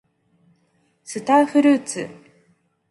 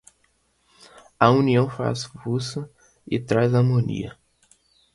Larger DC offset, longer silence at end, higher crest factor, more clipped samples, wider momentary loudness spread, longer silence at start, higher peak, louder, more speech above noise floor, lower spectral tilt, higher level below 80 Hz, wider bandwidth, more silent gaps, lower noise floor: neither; about the same, 0.8 s vs 0.8 s; second, 18 dB vs 24 dB; neither; first, 17 LU vs 14 LU; about the same, 1.1 s vs 1.2 s; second, -4 dBFS vs 0 dBFS; first, -19 LUFS vs -22 LUFS; about the same, 46 dB vs 45 dB; second, -4.5 dB/octave vs -7 dB/octave; second, -72 dBFS vs -56 dBFS; about the same, 11.5 kHz vs 11.5 kHz; neither; about the same, -65 dBFS vs -66 dBFS